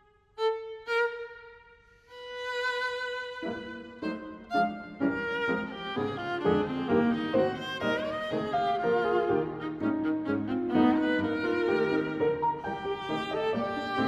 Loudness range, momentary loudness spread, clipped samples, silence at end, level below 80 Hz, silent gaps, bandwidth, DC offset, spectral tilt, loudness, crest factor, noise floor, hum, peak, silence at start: 6 LU; 10 LU; under 0.1%; 0 s; -60 dBFS; none; 12 kHz; under 0.1%; -6.5 dB/octave; -30 LUFS; 18 dB; -57 dBFS; none; -12 dBFS; 0.35 s